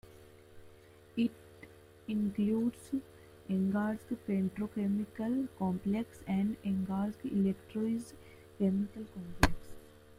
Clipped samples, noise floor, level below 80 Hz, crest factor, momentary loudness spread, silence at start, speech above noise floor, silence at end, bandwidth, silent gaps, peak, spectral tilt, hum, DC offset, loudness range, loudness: under 0.1%; -58 dBFS; -52 dBFS; 30 dB; 18 LU; 0.1 s; 24 dB; 0.05 s; 16 kHz; none; -6 dBFS; -7 dB/octave; none; under 0.1%; 2 LU; -35 LUFS